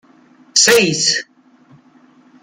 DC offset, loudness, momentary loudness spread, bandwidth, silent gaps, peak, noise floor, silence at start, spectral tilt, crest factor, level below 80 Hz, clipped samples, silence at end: under 0.1%; -12 LUFS; 7 LU; 16 kHz; none; 0 dBFS; -49 dBFS; 0.55 s; -1.5 dB/octave; 18 dB; -60 dBFS; under 0.1%; 1.2 s